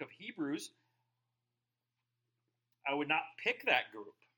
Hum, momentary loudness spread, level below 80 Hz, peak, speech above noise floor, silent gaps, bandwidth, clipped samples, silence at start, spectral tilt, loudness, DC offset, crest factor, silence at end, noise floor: none; 16 LU; under -90 dBFS; -16 dBFS; 52 dB; none; 17 kHz; under 0.1%; 0 s; -3.5 dB/octave; -36 LUFS; under 0.1%; 24 dB; 0.25 s; -89 dBFS